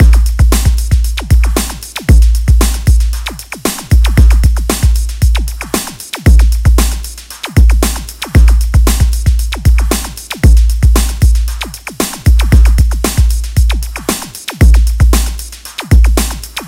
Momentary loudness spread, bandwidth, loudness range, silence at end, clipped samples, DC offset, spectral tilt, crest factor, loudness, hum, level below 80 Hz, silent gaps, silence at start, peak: 10 LU; 16.5 kHz; 2 LU; 0 s; 0.6%; under 0.1%; -5 dB/octave; 8 dB; -12 LUFS; none; -10 dBFS; none; 0 s; 0 dBFS